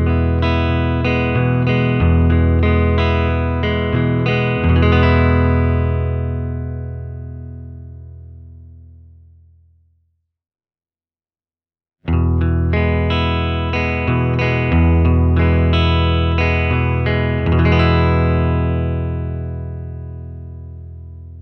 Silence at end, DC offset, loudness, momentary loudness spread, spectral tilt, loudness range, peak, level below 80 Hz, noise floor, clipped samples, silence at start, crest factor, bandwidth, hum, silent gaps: 0 s; under 0.1%; -16 LUFS; 18 LU; -9 dB/octave; 10 LU; 0 dBFS; -24 dBFS; under -90 dBFS; under 0.1%; 0 s; 16 dB; 5.8 kHz; none; none